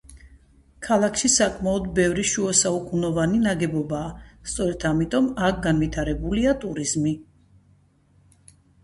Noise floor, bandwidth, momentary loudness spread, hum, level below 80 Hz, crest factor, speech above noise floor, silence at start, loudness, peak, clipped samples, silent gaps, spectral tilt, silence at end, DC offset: -59 dBFS; 11.5 kHz; 9 LU; none; -42 dBFS; 20 dB; 37 dB; 0.1 s; -22 LUFS; -4 dBFS; under 0.1%; none; -4 dB/octave; 1.6 s; under 0.1%